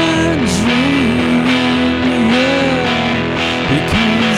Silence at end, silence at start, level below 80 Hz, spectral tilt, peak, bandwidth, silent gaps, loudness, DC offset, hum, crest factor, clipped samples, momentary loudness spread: 0 s; 0 s; -34 dBFS; -5 dB/octave; -2 dBFS; 13.5 kHz; none; -13 LUFS; under 0.1%; none; 12 dB; under 0.1%; 3 LU